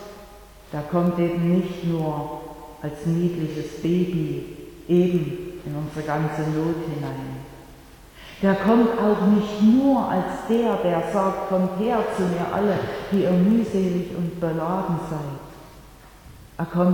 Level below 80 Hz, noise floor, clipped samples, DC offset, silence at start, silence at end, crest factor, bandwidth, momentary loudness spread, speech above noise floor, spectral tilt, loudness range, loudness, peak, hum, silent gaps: -50 dBFS; -46 dBFS; under 0.1%; under 0.1%; 0 s; 0 s; 18 dB; 18.5 kHz; 16 LU; 24 dB; -8 dB/octave; 6 LU; -23 LUFS; -6 dBFS; none; none